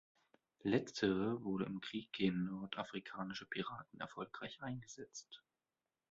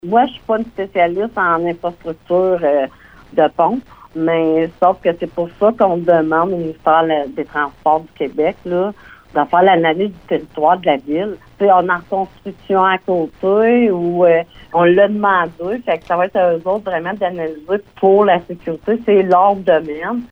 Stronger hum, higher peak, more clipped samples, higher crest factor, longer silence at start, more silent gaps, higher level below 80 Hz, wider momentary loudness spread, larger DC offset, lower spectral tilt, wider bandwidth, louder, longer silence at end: neither; second, -20 dBFS vs -2 dBFS; neither; first, 22 dB vs 14 dB; first, 0.65 s vs 0.05 s; neither; second, -74 dBFS vs -50 dBFS; first, 14 LU vs 10 LU; neither; second, -4.5 dB/octave vs -8 dB/octave; first, 7.6 kHz vs 5.8 kHz; second, -42 LUFS vs -16 LUFS; first, 0.75 s vs 0.05 s